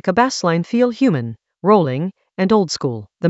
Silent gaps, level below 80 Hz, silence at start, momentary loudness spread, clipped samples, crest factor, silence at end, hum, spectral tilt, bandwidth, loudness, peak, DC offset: none; -58 dBFS; 0.05 s; 10 LU; under 0.1%; 18 dB; 0 s; none; -6 dB/octave; 8.2 kHz; -18 LUFS; 0 dBFS; under 0.1%